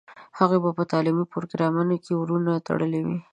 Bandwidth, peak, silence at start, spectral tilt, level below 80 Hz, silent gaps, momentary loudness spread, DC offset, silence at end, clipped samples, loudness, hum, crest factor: 8.8 kHz; -4 dBFS; 0.1 s; -8.5 dB/octave; -68 dBFS; none; 5 LU; under 0.1%; 0.1 s; under 0.1%; -24 LUFS; none; 20 dB